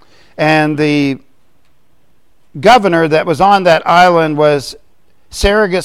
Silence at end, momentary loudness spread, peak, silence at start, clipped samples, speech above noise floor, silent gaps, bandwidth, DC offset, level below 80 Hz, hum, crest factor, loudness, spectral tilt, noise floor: 0 s; 10 LU; 0 dBFS; 0.4 s; under 0.1%; 47 dB; none; 16 kHz; 0.8%; -32 dBFS; none; 12 dB; -11 LUFS; -5.5 dB/octave; -58 dBFS